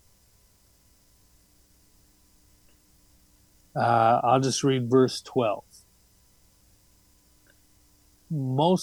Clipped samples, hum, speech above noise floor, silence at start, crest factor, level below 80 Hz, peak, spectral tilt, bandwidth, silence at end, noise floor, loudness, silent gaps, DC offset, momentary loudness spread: under 0.1%; 60 Hz at -55 dBFS; 38 dB; 3.75 s; 20 dB; -64 dBFS; -10 dBFS; -5.5 dB/octave; 20 kHz; 0 s; -61 dBFS; -24 LUFS; none; under 0.1%; 13 LU